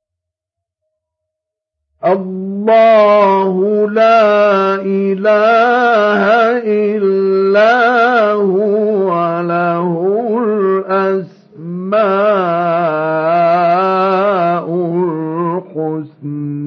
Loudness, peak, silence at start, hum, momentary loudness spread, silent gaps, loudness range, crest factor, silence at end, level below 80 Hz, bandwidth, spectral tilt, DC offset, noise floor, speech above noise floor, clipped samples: -12 LUFS; -2 dBFS; 2 s; none; 10 LU; none; 4 LU; 12 dB; 0 s; -74 dBFS; 6.6 kHz; -7.5 dB/octave; under 0.1%; -81 dBFS; 71 dB; under 0.1%